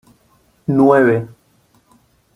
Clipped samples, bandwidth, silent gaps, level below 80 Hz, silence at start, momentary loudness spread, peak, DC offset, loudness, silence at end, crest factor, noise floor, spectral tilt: under 0.1%; 10.5 kHz; none; -56 dBFS; 0.7 s; 17 LU; -2 dBFS; under 0.1%; -14 LUFS; 1.1 s; 16 dB; -56 dBFS; -9.5 dB/octave